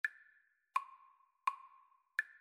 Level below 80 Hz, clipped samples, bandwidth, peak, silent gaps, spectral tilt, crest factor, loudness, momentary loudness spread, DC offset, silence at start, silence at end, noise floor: under -90 dBFS; under 0.1%; 15 kHz; -20 dBFS; none; 3 dB/octave; 24 dB; -42 LUFS; 21 LU; under 0.1%; 0.05 s; 0.15 s; -72 dBFS